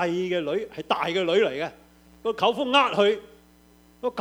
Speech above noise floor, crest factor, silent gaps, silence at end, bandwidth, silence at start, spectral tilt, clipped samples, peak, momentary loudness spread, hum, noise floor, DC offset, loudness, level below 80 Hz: 32 dB; 20 dB; none; 0 s; 16 kHz; 0 s; -4.5 dB/octave; under 0.1%; -6 dBFS; 12 LU; none; -56 dBFS; under 0.1%; -24 LUFS; -62 dBFS